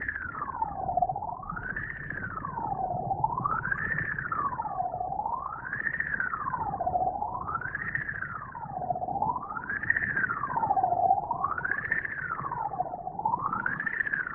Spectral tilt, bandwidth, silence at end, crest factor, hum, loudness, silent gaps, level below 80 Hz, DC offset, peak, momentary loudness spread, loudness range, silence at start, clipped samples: -6.5 dB/octave; 3.4 kHz; 0 s; 20 dB; none; -31 LUFS; none; -54 dBFS; under 0.1%; -10 dBFS; 8 LU; 4 LU; 0 s; under 0.1%